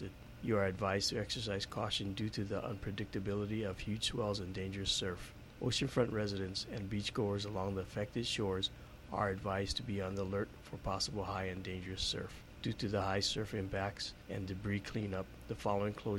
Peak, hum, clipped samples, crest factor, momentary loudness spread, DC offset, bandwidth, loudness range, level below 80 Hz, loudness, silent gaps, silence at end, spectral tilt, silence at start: -20 dBFS; none; under 0.1%; 18 dB; 8 LU; under 0.1%; 16.5 kHz; 2 LU; -56 dBFS; -38 LUFS; none; 0 s; -4.5 dB/octave; 0 s